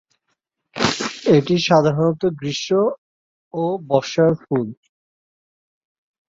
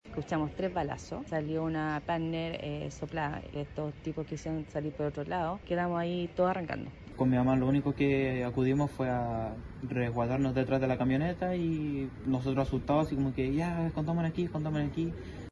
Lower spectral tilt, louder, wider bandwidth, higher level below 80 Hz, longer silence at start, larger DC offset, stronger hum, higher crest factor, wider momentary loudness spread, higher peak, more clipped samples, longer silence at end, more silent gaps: second, -5.5 dB/octave vs -8 dB/octave; first, -19 LUFS vs -32 LUFS; second, 8 kHz vs 11.5 kHz; second, -58 dBFS vs -50 dBFS; first, 0.75 s vs 0.05 s; neither; neither; about the same, 20 dB vs 16 dB; about the same, 10 LU vs 9 LU; first, 0 dBFS vs -16 dBFS; neither; first, 1.55 s vs 0 s; first, 2.98-3.51 s vs none